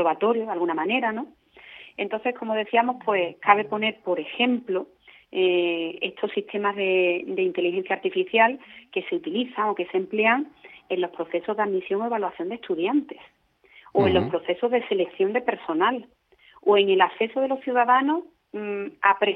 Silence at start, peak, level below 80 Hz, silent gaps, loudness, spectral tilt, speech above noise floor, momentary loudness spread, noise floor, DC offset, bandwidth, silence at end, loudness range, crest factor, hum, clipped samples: 0 s; -2 dBFS; -64 dBFS; none; -24 LUFS; -8 dB/octave; 32 dB; 11 LU; -55 dBFS; under 0.1%; 4.2 kHz; 0 s; 3 LU; 22 dB; none; under 0.1%